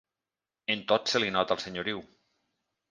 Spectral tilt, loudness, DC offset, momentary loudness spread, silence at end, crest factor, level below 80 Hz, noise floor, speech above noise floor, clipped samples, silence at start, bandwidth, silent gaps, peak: -3.5 dB/octave; -29 LUFS; under 0.1%; 10 LU; 0.85 s; 22 dB; -68 dBFS; under -90 dBFS; over 61 dB; under 0.1%; 0.7 s; 10 kHz; none; -10 dBFS